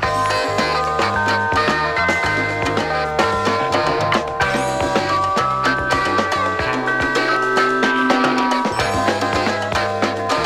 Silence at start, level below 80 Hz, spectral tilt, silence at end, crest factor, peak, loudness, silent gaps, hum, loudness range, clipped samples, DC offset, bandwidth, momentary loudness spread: 0 s; -40 dBFS; -4 dB/octave; 0 s; 16 dB; -2 dBFS; -18 LUFS; none; none; 1 LU; under 0.1%; under 0.1%; 15.5 kHz; 3 LU